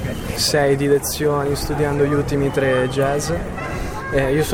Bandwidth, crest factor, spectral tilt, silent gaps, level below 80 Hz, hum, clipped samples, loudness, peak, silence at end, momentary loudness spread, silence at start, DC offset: 17 kHz; 14 dB; -5 dB/octave; none; -34 dBFS; none; under 0.1%; -19 LUFS; -6 dBFS; 0 s; 8 LU; 0 s; under 0.1%